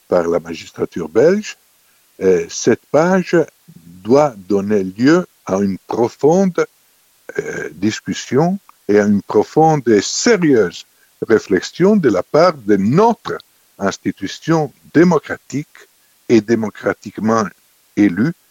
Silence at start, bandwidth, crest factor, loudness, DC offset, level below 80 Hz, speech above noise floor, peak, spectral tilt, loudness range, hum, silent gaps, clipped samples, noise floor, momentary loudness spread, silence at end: 0.1 s; 16.5 kHz; 16 dB; -16 LUFS; under 0.1%; -56 dBFS; 40 dB; 0 dBFS; -6 dB/octave; 4 LU; none; none; under 0.1%; -55 dBFS; 12 LU; 0.2 s